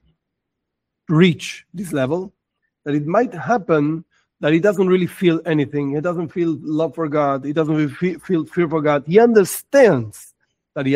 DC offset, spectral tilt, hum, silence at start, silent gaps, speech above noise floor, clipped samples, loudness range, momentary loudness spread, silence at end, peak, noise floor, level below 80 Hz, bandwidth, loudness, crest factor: under 0.1%; -6.5 dB/octave; none; 1.1 s; none; 61 dB; under 0.1%; 4 LU; 12 LU; 0 s; 0 dBFS; -79 dBFS; -60 dBFS; 16 kHz; -18 LUFS; 18 dB